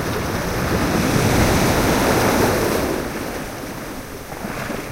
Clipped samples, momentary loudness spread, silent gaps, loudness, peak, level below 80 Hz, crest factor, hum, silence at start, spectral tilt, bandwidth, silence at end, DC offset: under 0.1%; 14 LU; none; -19 LUFS; -2 dBFS; -32 dBFS; 18 dB; none; 0 s; -5 dB/octave; 16 kHz; 0 s; under 0.1%